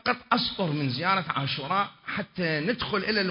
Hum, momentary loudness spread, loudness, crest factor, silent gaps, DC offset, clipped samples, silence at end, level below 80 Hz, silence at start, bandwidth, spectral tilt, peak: none; 5 LU; -27 LUFS; 20 dB; none; under 0.1%; under 0.1%; 0 s; -58 dBFS; 0.05 s; 5.6 kHz; -9.5 dB/octave; -8 dBFS